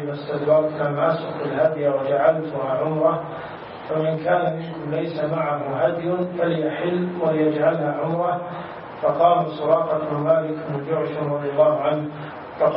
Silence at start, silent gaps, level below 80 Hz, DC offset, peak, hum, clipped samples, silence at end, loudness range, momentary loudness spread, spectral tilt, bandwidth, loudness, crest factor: 0 s; none; -64 dBFS; under 0.1%; -4 dBFS; none; under 0.1%; 0 s; 3 LU; 9 LU; -11.5 dB/octave; 5.4 kHz; -22 LUFS; 18 dB